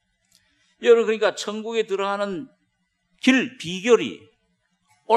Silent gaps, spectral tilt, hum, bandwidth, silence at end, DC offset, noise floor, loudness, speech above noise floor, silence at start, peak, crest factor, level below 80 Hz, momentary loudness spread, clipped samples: none; -4 dB/octave; none; 11.5 kHz; 0 s; under 0.1%; -72 dBFS; -22 LUFS; 51 dB; 0.8 s; -2 dBFS; 22 dB; -72 dBFS; 12 LU; under 0.1%